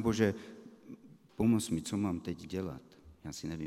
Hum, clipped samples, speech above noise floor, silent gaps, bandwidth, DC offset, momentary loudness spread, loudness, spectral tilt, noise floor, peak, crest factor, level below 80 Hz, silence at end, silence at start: none; under 0.1%; 20 dB; none; 14.5 kHz; under 0.1%; 23 LU; -35 LUFS; -6 dB/octave; -54 dBFS; -14 dBFS; 22 dB; -62 dBFS; 0 s; 0 s